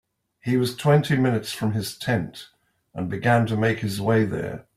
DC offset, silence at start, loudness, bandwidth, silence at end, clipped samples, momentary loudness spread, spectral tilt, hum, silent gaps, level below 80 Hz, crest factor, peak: under 0.1%; 0.45 s; -23 LUFS; 15.5 kHz; 0.15 s; under 0.1%; 13 LU; -6.5 dB/octave; none; none; -56 dBFS; 18 dB; -6 dBFS